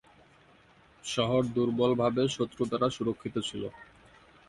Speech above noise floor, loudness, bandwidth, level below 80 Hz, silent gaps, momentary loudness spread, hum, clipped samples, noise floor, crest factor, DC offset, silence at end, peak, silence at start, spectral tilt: 31 dB; -30 LUFS; 11.5 kHz; -60 dBFS; none; 10 LU; none; under 0.1%; -60 dBFS; 18 dB; under 0.1%; 0.65 s; -14 dBFS; 1.05 s; -5.5 dB/octave